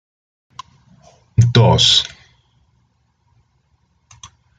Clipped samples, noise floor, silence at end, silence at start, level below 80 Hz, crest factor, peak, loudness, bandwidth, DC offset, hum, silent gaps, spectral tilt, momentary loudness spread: under 0.1%; -62 dBFS; 0.35 s; 1.4 s; -44 dBFS; 20 dB; 0 dBFS; -13 LUFS; 9.2 kHz; under 0.1%; none; none; -4.5 dB/octave; 11 LU